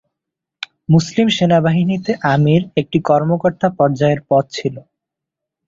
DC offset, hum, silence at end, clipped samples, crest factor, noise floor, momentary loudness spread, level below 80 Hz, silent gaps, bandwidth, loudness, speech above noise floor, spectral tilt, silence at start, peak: under 0.1%; none; 0.9 s; under 0.1%; 14 dB; -82 dBFS; 10 LU; -52 dBFS; none; 7.6 kHz; -15 LUFS; 68 dB; -7 dB/octave; 0.9 s; -2 dBFS